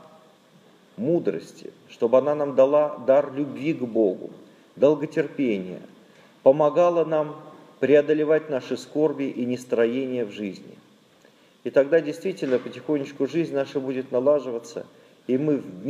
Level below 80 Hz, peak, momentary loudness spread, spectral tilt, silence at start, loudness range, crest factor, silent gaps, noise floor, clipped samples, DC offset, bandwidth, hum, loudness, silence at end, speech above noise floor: -80 dBFS; -4 dBFS; 16 LU; -7 dB/octave; 1 s; 4 LU; 20 dB; none; -56 dBFS; under 0.1%; under 0.1%; 11 kHz; none; -23 LUFS; 0 s; 33 dB